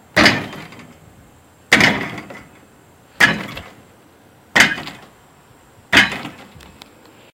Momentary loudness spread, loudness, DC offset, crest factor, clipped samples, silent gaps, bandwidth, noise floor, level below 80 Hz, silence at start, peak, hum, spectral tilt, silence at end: 22 LU; -15 LUFS; under 0.1%; 20 dB; under 0.1%; none; 17 kHz; -48 dBFS; -46 dBFS; 0.15 s; 0 dBFS; none; -3 dB/octave; 1 s